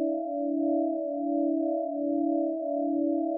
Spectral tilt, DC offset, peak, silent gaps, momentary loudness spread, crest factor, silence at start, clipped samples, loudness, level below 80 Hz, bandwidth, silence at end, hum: -13 dB/octave; under 0.1%; -18 dBFS; none; 3 LU; 10 dB; 0 s; under 0.1%; -29 LUFS; under -90 dBFS; 0.8 kHz; 0 s; none